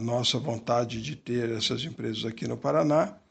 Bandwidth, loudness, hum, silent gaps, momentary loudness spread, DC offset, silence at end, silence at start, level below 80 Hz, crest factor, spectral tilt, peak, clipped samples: 8.8 kHz; -28 LUFS; none; none; 8 LU; under 0.1%; 0.15 s; 0 s; -60 dBFS; 18 dB; -5 dB/octave; -10 dBFS; under 0.1%